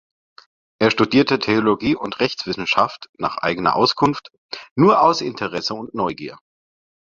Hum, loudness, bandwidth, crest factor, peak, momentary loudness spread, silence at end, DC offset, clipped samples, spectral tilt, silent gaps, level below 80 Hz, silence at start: none; -19 LUFS; 7.4 kHz; 18 dB; -2 dBFS; 12 LU; 0.7 s; under 0.1%; under 0.1%; -5.5 dB/octave; 3.09-3.13 s, 4.38-4.49 s, 4.71-4.76 s; -54 dBFS; 0.8 s